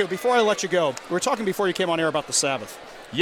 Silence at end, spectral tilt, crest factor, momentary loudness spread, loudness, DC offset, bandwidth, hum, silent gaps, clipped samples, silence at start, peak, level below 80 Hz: 0 s; -3 dB/octave; 16 dB; 10 LU; -23 LUFS; under 0.1%; 18 kHz; none; none; under 0.1%; 0 s; -8 dBFS; -64 dBFS